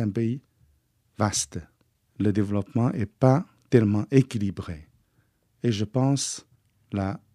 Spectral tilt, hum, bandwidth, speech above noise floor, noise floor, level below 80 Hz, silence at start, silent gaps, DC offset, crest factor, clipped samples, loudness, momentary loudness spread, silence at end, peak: -6 dB/octave; none; 13 kHz; 43 dB; -67 dBFS; -58 dBFS; 0 s; none; under 0.1%; 22 dB; under 0.1%; -25 LUFS; 14 LU; 0.2 s; -4 dBFS